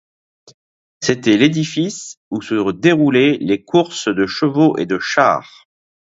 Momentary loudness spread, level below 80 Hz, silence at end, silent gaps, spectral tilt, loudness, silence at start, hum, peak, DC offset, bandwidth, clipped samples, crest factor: 9 LU; -56 dBFS; 0.7 s; 2.17-2.31 s; -5 dB/octave; -16 LUFS; 1 s; none; 0 dBFS; under 0.1%; 7.8 kHz; under 0.1%; 16 dB